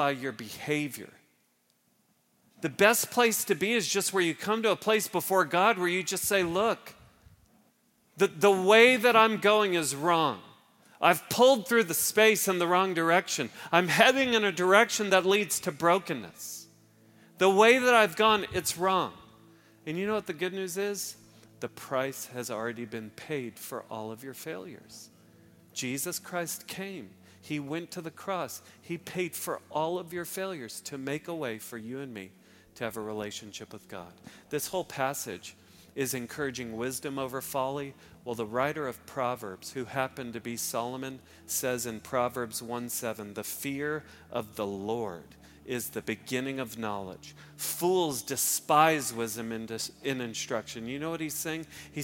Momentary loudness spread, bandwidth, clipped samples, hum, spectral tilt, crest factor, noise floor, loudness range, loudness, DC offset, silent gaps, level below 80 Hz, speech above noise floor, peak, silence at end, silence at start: 18 LU; 17 kHz; under 0.1%; none; -3 dB/octave; 26 dB; -71 dBFS; 13 LU; -28 LUFS; under 0.1%; none; -70 dBFS; 42 dB; -4 dBFS; 0 s; 0 s